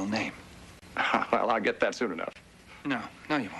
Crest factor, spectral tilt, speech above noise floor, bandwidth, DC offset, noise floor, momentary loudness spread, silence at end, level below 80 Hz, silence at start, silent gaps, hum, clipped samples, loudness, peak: 20 dB; -4.5 dB/octave; 19 dB; 12 kHz; under 0.1%; -50 dBFS; 15 LU; 0 s; -62 dBFS; 0 s; none; none; under 0.1%; -30 LUFS; -10 dBFS